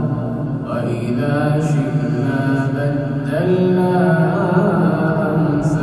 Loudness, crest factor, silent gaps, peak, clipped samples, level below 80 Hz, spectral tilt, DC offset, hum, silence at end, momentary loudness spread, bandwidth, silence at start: -17 LUFS; 14 dB; none; -2 dBFS; under 0.1%; -44 dBFS; -8.5 dB/octave; under 0.1%; none; 0 s; 6 LU; 12 kHz; 0 s